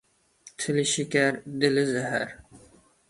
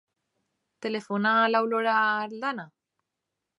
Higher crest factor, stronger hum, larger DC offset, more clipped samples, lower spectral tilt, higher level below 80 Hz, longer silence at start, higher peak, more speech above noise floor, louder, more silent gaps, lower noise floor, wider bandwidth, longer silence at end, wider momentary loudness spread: about the same, 20 dB vs 18 dB; neither; neither; neither; second, -4 dB/octave vs -5.5 dB/octave; first, -64 dBFS vs -80 dBFS; second, 0.45 s vs 0.8 s; about the same, -8 dBFS vs -10 dBFS; second, 29 dB vs 59 dB; about the same, -26 LUFS vs -25 LUFS; neither; second, -55 dBFS vs -85 dBFS; about the same, 11.5 kHz vs 11.5 kHz; second, 0.5 s vs 0.9 s; about the same, 11 LU vs 11 LU